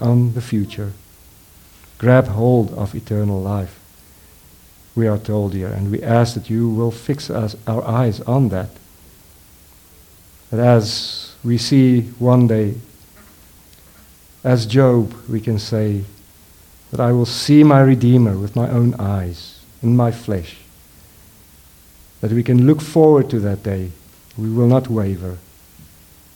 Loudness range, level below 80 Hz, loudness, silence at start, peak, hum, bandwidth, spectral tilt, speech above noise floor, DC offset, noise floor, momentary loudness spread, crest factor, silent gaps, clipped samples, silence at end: 7 LU; -48 dBFS; -17 LUFS; 0 s; 0 dBFS; none; 18.5 kHz; -7.5 dB/octave; 31 dB; under 0.1%; -46 dBFS; 14 LU; 18 dB; none; under 0.1%; 0.95 s